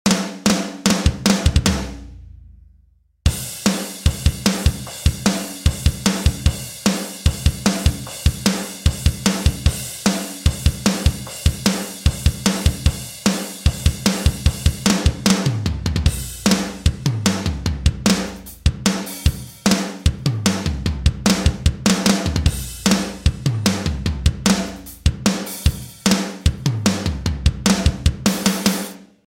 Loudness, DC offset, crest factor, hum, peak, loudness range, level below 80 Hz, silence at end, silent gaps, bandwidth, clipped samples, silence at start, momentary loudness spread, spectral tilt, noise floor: -20 LUFS; under 0.1%; 18 dB; none; 0 dBFS; 2 LU; -26 dBFS; 0.25 s; none; 16.5 kHz; under 0.1%; 0.05 s; 5 LU; -4.5 dB/octave; -55 dBFS